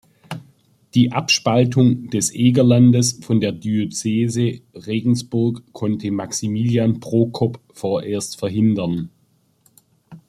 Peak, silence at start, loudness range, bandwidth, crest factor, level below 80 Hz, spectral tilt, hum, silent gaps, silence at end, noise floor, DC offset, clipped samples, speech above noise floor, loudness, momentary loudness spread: -2 dBFS; 0.3 s; 5 LU; 13.5 kHz; 16 dB; -56 dBFS; -5.5 dB/octave; none; none; 0.1 s; -61 dBFS; under 0.1%; under 0.1%; 43 dB; -19 LUFS; 11 LU